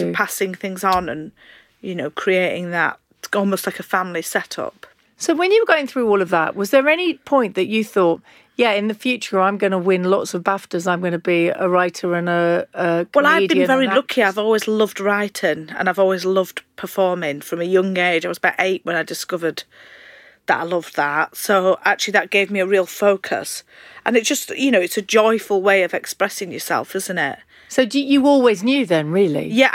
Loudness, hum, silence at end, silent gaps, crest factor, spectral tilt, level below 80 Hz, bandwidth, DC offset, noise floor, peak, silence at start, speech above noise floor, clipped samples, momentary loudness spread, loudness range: -18 LUFS; none; 0 s; none; 18 dB; -4.5 dB/octave; -62 dBFS; 17 kHz; under 0.1%; -46 dBFS; -2 dBFS; 0 s; 27 dB; under 0.1%; 9 LU; 4 LU